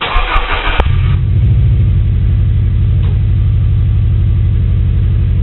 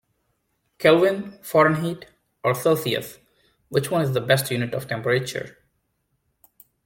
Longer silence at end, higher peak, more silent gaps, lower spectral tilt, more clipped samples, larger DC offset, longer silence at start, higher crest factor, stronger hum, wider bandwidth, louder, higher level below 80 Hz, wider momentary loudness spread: second, 0 s vs 1.35 s; first, 0 dBFS vs -4 dBFS; neither; about the same, -6 dB/octave vs -5 dB/octave; neither; first, 0.6% vs under 0.1%; second, 0 s vs 0.8 s; second, 10 dB vs 20 dB; neither; second, 4.2 kHz vs 17 kHz; first, -12 LUFS vs -22 LUFS; first, -14 dBFS vs -62 dBFS; second, 3 LU vs 13 LU